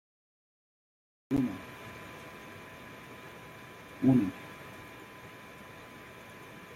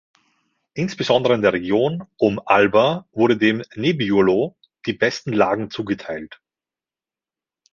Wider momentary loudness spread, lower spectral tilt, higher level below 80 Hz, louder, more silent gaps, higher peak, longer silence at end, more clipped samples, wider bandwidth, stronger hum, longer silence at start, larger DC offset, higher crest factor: first, 20 LU vs 12 LU; about the same, -7 dB/octave vs -6 dB/octave; second, -64 dBFS vs -56 dBFS; second, -32 LUFS vs -19 LUFS; neither; second, -14 dBFS vs -2 dBFS; second, 0 s vs 1.45 s; neither; first, 16 kHz vs 7.4 kHz; neither; first, 1.3 s vs 0.75 s; neither; first, 24 dB vs 18 dB